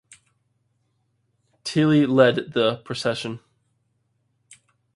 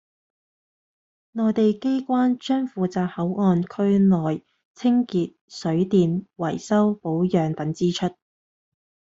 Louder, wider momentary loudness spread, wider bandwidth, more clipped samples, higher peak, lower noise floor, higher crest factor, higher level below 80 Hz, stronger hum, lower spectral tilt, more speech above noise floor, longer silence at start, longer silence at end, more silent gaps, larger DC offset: about the same, -21 LUFS vs -23 LUFS; first, 16 LU vs 8 LU; first, 11.5 kHz vs 7.8 kHz; neither; first, -4 dBFS vs -8 dBFS; second, -70 dBFS vs under -90 dBFS; first, 22 dB vs 16 dB; about the same, -66 dBFS vs -62 dBFS; neither; second, -6 dB/octave vs -7.5 dB/octave; second, 50 dB vs over 68 dB; first, 1.65 s vs 1.35 s; first, 1.6 s vs 1 s; second, none vs 4.65-4.74 s, 5.41-5.48 s; neither